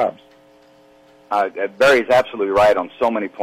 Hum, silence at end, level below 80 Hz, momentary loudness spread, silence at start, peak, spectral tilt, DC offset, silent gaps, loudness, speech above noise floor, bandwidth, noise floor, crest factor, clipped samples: none; 0 s; -54 dBFS; 8 LU; 0 s; -6 dBFS; -4.5 dB/octave; under 0.1%; none; -17 LUFS; 33 dB; 15.5 kHz; -50 dBFS; 12 dB; under 0.1%